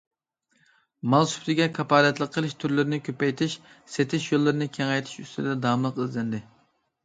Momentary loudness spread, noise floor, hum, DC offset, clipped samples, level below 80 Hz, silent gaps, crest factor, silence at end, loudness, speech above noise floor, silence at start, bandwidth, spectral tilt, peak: 11 LU; -71 dBFS; none; under 0.1%; under 0.1%; -68 dBFS; none; 20 dB; 0.65 s; -25 LUFS; 46 dB; 1.05 s; 9.4 kHz; -5.5 dB/octave; -6 dBFS